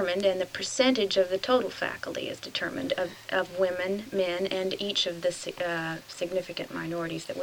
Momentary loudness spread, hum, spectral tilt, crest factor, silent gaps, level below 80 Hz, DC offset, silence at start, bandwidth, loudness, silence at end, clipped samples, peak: 9 LU; none; -3.5 dB/octave; 20 dB; none; -64 dBFS; under 0.1%; 0 s; 20 kHz; -29 LUFS; 0 s; under 0.1%; -10 dBFS